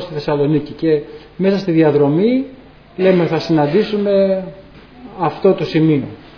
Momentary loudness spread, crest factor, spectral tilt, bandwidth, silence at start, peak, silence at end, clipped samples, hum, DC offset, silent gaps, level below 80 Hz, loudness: 8 LU; 14 dB; -8.5 dB/octave; 5.4 kHz; 0 s; -2 dBFS; 0.1 s; under 0.1%; none; under 0.1%; none; -48 dBFS; -15 LUFS